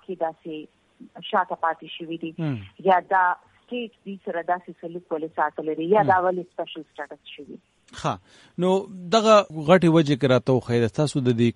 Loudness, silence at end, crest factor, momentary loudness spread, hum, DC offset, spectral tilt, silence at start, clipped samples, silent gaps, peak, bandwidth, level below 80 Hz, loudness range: -23 LUFS; 0.05 s; 20 dB; 19 LU; none; under 0.1%; -6.5 dB/octave; 0.1 s; under 0.1%; none; -2 dBFS; 11.5 kHz; -62 dBFS; 6 LU